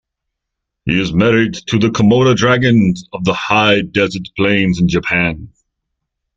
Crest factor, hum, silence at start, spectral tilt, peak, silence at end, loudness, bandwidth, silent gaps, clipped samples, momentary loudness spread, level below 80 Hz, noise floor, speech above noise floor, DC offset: 14 dB; none; 0.85 s; -6 dB/octave; 0 dBFS; 0.9 s; -13 LUFS; 7.8 kHz; none; under 0.1%; 7 LU; -40 dBFS; -78 dBFS; 65 dB; under 0.1%